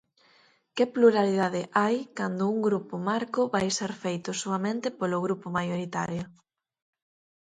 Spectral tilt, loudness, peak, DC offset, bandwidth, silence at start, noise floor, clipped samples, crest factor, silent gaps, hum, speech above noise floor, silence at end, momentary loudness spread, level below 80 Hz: -5 dB/octave; -28 LUFS; -8 dBFS; under 0.1%; 9.6 kHz; 0.75 s; -63 dBFS; under 0.1%; 20 dB; none; none; 36 dB; 1.1 s; 10 LU; -68 dBFS